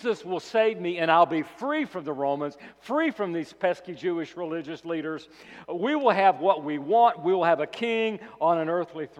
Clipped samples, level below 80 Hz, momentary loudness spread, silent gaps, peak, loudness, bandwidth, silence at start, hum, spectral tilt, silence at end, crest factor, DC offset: under 0.1%; -74 dBFS; 12 LU; none; -6 dBFS; -26 LUFS; 9.6 kHz; 0 s; none; -6 dB/octave; 0.15 s; 18 dB; under 0.1%